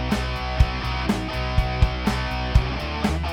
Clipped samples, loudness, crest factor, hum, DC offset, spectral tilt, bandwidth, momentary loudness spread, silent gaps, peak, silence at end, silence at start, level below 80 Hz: under 0.1%; -24 LUFS; 20 dB; none; under 0.1%; -6 dB/octave; 16 kHz; 3 LU; none; -4 dBFS; 0 s; 0 s; -26 dBFS